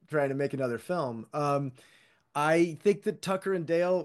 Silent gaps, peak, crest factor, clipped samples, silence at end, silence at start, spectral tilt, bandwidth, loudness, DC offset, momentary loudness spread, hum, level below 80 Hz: none; -12 dBFS; 16 dB; under 0.1%; 0 s; 0.1 s; -6.5 dB/octave; 12.5 kHz; -30 LUFS; under 0.1%; 7 LU; none; -76 dBFS